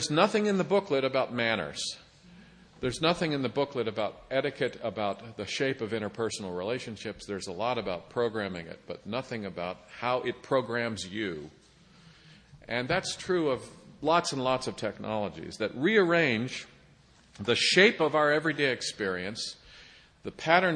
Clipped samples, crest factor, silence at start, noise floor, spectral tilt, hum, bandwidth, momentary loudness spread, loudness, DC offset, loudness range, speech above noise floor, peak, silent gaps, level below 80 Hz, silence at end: under 0.1%; 24 dB; 0 s; -59 dBFS; -4 dB/octave; none; 10 kHz; 13 LU; -29 LUFS; under 0.1%; 7 LU; 30 dB; -6 dBFS; none; -62 dBFS; 0 s